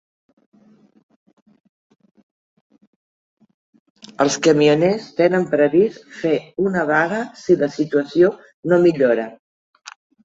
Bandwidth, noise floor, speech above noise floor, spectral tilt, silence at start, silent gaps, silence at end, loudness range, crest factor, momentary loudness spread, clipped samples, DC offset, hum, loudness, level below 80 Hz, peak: 7.8 kHz; -53 dBFS; 36 dB; -5.5 dB/octave; 4.2 s; 8.54-8.63 s; 0.9 s; 4 LU; 18 dB; 7 LU; under 0.1%; under 0.1%; none; -18 LUFS; -62 dBFS; -2 dBFS